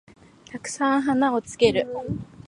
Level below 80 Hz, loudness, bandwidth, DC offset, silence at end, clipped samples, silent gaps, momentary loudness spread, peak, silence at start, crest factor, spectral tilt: -52 dBFS; -23 LUFS; 11.5 kHz; under 0.1%; 0.05 s; under 0.1%; none; 13 LU; -6 dBFS; 0.5 s; 20 dB; -5 dB/octave